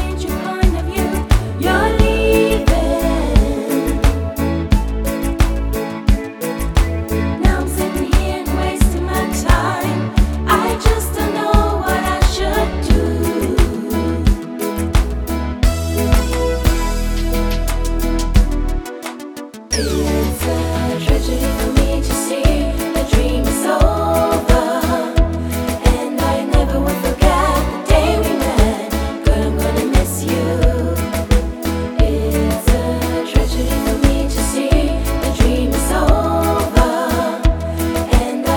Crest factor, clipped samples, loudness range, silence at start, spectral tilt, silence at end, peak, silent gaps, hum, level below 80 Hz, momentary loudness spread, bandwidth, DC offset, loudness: 16 dB; under 0.1%; 3 LU; 0 s; -5.5 dB/octave; 0 s; 0 dBFS; none; none; -18 dBFS; 5 LU; 20 kHz; under 0.1%; -17 LUFS